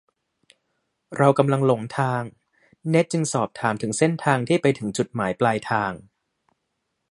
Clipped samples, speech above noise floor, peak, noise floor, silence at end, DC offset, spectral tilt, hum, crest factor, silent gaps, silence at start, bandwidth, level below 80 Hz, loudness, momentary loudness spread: under 0.1%; 55 dB; -2 dBFS; -77 dBFS; 1.15 s; under 0.1%; -6 dB/octave; none; 22 dB; none; 1.1 s; 11.5 kHz; -62 dBFS; -22 LUFS; 10 LU